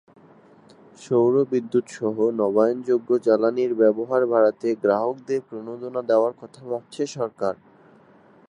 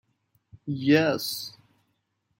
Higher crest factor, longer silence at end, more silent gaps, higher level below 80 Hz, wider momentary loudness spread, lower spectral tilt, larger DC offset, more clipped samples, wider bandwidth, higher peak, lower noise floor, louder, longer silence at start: about the same, 18 dB vs 20 dB; about the same, 0.95 s vs 0.9 s; neither; second, -74 dBFS vs -68 dBFS; second, 11 LU vs 18 LU; first, -7 dB/octave vs -5 dB/octave; neither; neither; second, 10.5 kHz vs 16.5 kHz; about the same, -6 dBFS vs -8 dBFS; second, -53 dBFS vs -75 dBFS; first, -22 LUFS vs -25 LUFS; first, 1 s vs 0.55 s